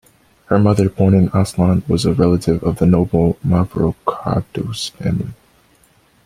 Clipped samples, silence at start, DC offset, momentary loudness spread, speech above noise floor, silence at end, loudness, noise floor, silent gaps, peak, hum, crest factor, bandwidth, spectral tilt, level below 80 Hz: under 0.1%; 0.5 s; under 0.1%; 8 LU; 39 dB; 0.95 s; -16 LUFS; -54 dBFS; none; 0 dBFS; none; 16 dB; 14 kHz; -7.5 dB/octave; -40 dBFS